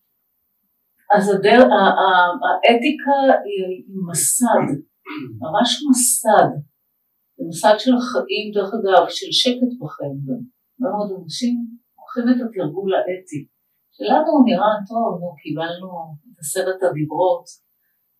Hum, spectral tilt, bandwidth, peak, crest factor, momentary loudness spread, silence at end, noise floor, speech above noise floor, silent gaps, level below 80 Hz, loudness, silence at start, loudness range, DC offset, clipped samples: none; -3.5 dB/octave; 15.5 kHz; 0 dBFS; 18 dB; 16 LU; 0.65 s; -69 dBFS; 51 dB; none; -68 dBFS; -18 LUFS; 1.1 s; 8 LU; under 0.1%; under 0.1%